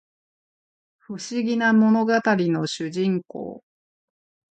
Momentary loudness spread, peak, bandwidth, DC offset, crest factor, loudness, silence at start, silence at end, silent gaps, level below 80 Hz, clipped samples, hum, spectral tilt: 17 LU; -6 dBFS; 8.8 kHz; under 0.1%; 18 dB; -21 LUFS; 1.1 s; 1 s; none; -72 dBFS; under 0.1%; none; -6 dB/octave